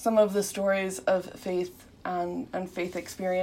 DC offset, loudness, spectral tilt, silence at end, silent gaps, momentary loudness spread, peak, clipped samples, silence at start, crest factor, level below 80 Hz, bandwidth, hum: under 0.1%; -30 LUFS; -5 dB/octave; 0 s; none; 9 LU; -10 dBFS; under 0.1%; 0 s; 18 dB; -62 dBFS; 16 kHz; none